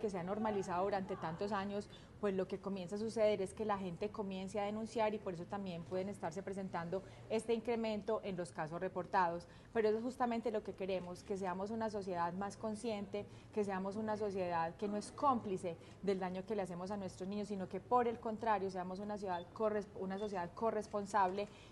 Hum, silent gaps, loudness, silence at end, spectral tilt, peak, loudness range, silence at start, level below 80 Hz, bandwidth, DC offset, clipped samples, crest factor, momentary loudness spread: none; none; -40 LUFS; 0 s; -6 dB/octave; -20 dBFS; 2 LU; 0 s; -68 dBFS; 12 kHz; under 0.1%; under 0.1%; 20 dB; 8 LU